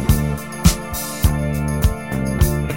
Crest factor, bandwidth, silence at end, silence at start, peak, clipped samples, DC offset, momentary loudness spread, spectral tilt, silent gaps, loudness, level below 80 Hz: 18 dB; 16.5 kHz; 0 s; 0 s; 0 dBFS; under 0.1%; 0.8%; 6 LU; -5.5 dB/octave; none; -20 LUFS; -24 dBFS